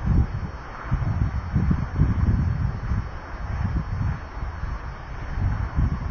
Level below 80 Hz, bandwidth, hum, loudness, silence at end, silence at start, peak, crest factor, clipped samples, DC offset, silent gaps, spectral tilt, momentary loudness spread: -28 dBFS; 6.6 kHz; none; -27 LUFS; 0 s; 0 s; -6 dBFS; 18 dB; under 0.1%; under 0.1%; none; -9 dB/octave; 12 LU